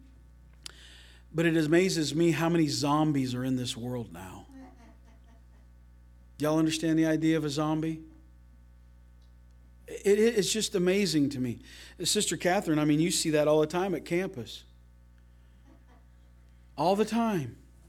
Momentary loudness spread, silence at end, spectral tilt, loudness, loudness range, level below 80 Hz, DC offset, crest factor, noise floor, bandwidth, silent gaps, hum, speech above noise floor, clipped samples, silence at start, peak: 18 LU; 0.35 s; -5 dB/octave; -28 LUFS; 7 LU; -56 dBFS; under 0.1%; 18 dB; -56 dBFS; 16 kHz; none; 60 Hz at -55 dBFS; 28 dB; under 0.1%; 0.8 s; -12 dBFS